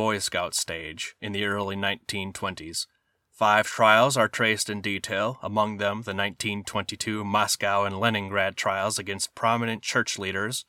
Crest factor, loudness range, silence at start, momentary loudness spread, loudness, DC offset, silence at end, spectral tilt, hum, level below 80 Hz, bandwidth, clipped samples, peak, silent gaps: 22 dB; 4 LU; 0 s; 10 LU; -25 LUFS; under 0.1%; 0.05 s; -3 dB/octave; none; -64 dBFS; 18 kHz; under 0.1%; -4 dBFS; none